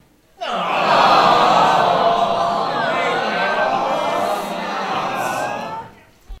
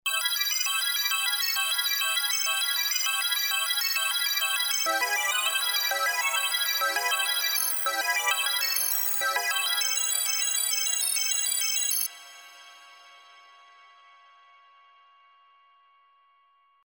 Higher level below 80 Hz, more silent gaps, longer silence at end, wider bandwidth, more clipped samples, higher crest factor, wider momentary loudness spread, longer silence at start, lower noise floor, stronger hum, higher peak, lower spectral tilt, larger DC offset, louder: first, -48 dBFS vs -88 dBFS; neither; second, 0.05 s vs 3.45 s; second, 16 kHz vs over 20 kHz; neither; about the same, 18 dB vs 18 dB; first, 12 LU vs 1 LU; first, 0.4 s vs 0.05 s; second, -41 dBFS vs -64 dBFS; neither; first, 0 dBFS vs -10 dBFS; first, -4 dB/octave vs 5.5 dB/octave; neither; first, -17 LUFS vs -24 LUFS